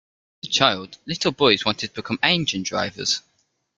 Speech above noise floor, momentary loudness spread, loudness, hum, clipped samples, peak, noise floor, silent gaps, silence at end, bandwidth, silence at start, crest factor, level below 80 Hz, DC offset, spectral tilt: 47 dB; 10 LU; -21 LUFS; none; under 0.1%; 0 dBFS; -69 dBFS; none; 0.6 s; 9.4 kHz; 0.45 s; 24 dB; -58 dBFS; under 0.1%; -3 dB/octave